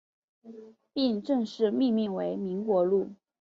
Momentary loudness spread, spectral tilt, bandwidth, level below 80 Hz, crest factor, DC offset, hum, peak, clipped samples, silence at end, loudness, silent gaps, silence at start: 13 LU; -7.5 dB/octave; 7.6 kHz; -74 dBFS; 16 dB; under 0.1%; none; -14 dBFS; under 0.1%; 0.3 s; -28 LUFS; none; 0.45 s